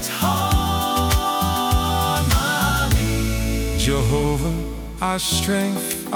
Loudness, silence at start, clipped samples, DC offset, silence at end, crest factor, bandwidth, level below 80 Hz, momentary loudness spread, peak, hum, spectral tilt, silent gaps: -20 LUFS; 0 s; under 0.1%; under 0.1%; 0 s; 14 dB; over 20 kHz; -26 dBFS; 5 LU; -6 dBFS; none; -4.5 dB/octave; none